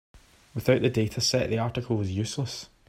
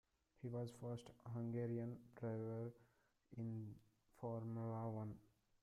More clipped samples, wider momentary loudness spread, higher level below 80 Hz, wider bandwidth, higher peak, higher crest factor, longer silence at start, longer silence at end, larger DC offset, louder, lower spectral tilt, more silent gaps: neither; about the same, 9 LU vs 9 LU; first, -54 dBFS vs -78 dBFS; first, 16 kHz vs 11.5 kHz; first, -8 dBFS vs -34 dBFS; first, 20 dB vs 14 dB; second, 0.15 s vs 0.4 s; second, 0.25 s vs 0.4 s; neither; first, -27 LUFS vs -50 LUFS; second, -5 dB/octave vs -9 dB/octave; neither